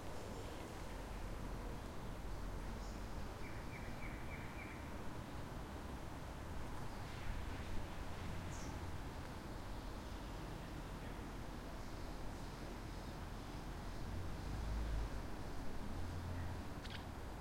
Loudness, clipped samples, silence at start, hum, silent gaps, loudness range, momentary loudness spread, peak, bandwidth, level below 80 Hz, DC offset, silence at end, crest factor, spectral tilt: -49 LUFS; under 0.1%; 0 s; none; none; 3 LU; 3 LU; -30 dBFS; 16.5 kHz; -50 dBFS; under 0.1%; 0 s; 16 dB; -5.5 dB/octave